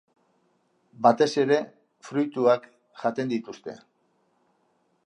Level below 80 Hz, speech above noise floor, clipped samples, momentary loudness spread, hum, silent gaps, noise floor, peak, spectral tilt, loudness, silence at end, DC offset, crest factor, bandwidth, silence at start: -80 dBFS; 45 dB; under 0.1%; 19 LU; none; none; -69 dBFS; -4 dBFS; -5.5 dB/octave; -25 LUFS; 1.3 s; under 0.1%; 24 dB; 10.5 kHz; 1 s